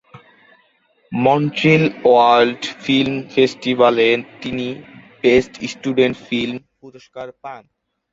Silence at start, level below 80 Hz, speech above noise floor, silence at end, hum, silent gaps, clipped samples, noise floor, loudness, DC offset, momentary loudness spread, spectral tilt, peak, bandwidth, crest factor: 0.15 s; -54 dBFS; 43 dB; 0.55 s; none; none; under 0.1%; -59 dBFS; -17 LUFS; under 0.1%; 19 LU; -6 dB/octave; 0 dBFS; 7.8 kHz; 18 dB